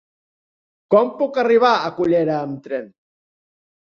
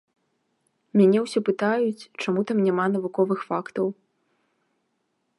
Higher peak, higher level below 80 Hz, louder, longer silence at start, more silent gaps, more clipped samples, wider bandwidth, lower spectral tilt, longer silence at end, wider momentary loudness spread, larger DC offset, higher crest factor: first, -2 dBFS vs -8 dBFS; first, -62 dBFS vs -78 dBFS; first, -18 LUFS vs -24 LUFS; about the same, 0.9 s vs 0.95 s; neither; neither; second, 6.8 kHz vs 11.5 kHz; about the same, -6.5 dB/octave vs -7 dB/octave; second, 1 s vs 1.45 s; first, 13 LU vs 9 LU; neither; about the same, 18 dB vs 18 dB